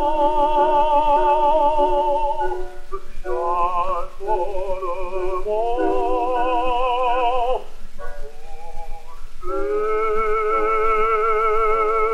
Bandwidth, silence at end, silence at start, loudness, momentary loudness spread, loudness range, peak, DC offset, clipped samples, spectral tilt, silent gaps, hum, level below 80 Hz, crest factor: 6 kHz; 0 s; 0 s; -20 LUFS; 20 LU; 6 LU; -6 dBFS; under 0.1%; under 0.1%; -5.5 dB/octave; none; none; -30 dBFS; 14 dB